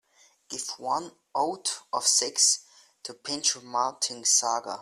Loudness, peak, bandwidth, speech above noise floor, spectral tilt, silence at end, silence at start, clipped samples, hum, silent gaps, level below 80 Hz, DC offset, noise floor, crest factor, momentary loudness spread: -25 LUFS; -8 dBFS; 15.5 kHz; 25 dB; 0.5 dB/octave; 0 s; 0.5 s; under 0.1%; none; none; -78 dBFS; under 0.1%; -53 dBFS; 20 dB; 13 LU